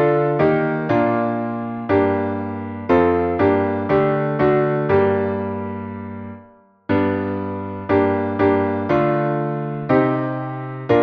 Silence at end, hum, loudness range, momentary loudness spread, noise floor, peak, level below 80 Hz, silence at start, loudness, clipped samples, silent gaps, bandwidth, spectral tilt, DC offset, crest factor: 0 s; none; 4 LU; 11 LU; -48 dBFS; -2 dBFS; -50 dBFS; 0 s; -19 LUFS; under 0.1%; none; 5.6 kHz; -10 dB/octave; under 0.1%; 16 dB